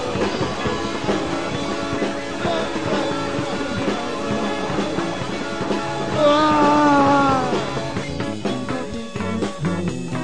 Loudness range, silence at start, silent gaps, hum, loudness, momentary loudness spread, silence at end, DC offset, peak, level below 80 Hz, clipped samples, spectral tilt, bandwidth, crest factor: 5 LU; 0 s; none; none; -21 LUFS; 10 LU; 0 s; 2%; -4 dBFS; -44 dBFS; under 0.1%; -5.5 dB/octave; 10.5 kHz; 16 dB